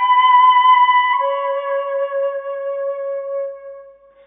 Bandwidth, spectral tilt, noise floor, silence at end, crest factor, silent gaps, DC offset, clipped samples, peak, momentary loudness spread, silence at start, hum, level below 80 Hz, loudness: 3.5 kHz; -2.5 dB/octave; -42 dBFS; 0.35 s; 12 dB; none; under 0.1%; under 0.1%; -4 dBFS; 15 LU; 0 s; none; -72 dBFS; -16 LUFS